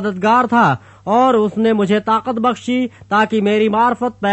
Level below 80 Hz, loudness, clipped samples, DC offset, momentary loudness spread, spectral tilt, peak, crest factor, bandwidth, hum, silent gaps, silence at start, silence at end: -56 dBFS; -15 LUFS; under 0.1%; under 0.1%; 6 LU; -6.5 dB/octave; -2 dBFS; 12 dB; 8.4 kHz; none; none; 0 s; 0 s